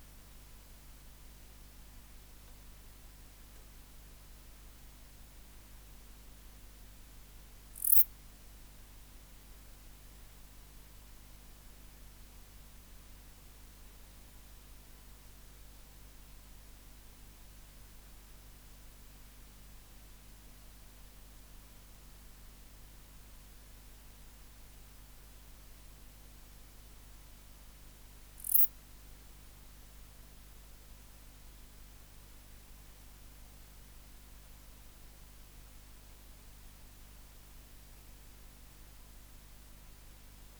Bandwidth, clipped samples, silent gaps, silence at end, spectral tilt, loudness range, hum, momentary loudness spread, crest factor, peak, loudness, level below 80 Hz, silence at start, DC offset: over 20 kHz; under 0.1%; none; 0 s; -2.5 dB/octave; 25 LU; 50 Hz at -55 dBFS; 0 LU; 40 dB; -4 dBFS; -25 LUFS; -56 dBFS; 0 s; under 0.1%